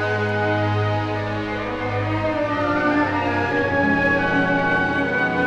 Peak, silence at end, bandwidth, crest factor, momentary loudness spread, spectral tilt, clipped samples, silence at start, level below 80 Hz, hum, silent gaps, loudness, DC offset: -6 dBFS; 0 s; 8.8 kHz; 14 dB; 6 LU; -7 dB/octave; under 0.1%; 0 s; -46 dBFS; none; none; -20 LUFS; under 0.1%